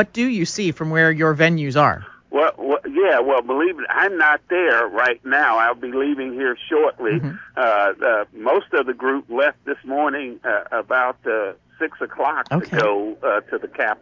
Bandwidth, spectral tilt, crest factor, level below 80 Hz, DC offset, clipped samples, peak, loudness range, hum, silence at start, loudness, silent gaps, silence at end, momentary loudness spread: 7.6 kHz; -5.5 dB/octave; 18 dB; -58 dBFS; under 0.1%; under 0.1%; 0 dBFS; 4 LU; none; 0 s; -19 LUFS; none; 0.05 s; 8 LU